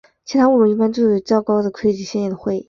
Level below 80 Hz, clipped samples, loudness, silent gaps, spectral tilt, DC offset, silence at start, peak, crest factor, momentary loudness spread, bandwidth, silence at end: -56 dBFS; under 0.1%; -17 LUFS; none; -6.5 dB/octave; under 0.1%; 0.3 s; -4 dBFS; 14 dB; 8 LU; 7.2 kHz; 0.05 s